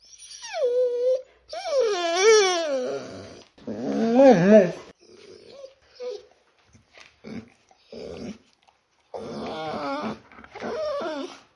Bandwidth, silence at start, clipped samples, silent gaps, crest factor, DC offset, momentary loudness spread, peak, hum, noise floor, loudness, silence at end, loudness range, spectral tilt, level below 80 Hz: 11 kHz; 0.2 s; under 0.1%; none; 22 dB; under 0.1%; 24 LU; -2 dBFS; none; -63 dBFS; -22 LUFS; 0.2 s; 22 LU; -4.5 dB/octave; -66 dBFS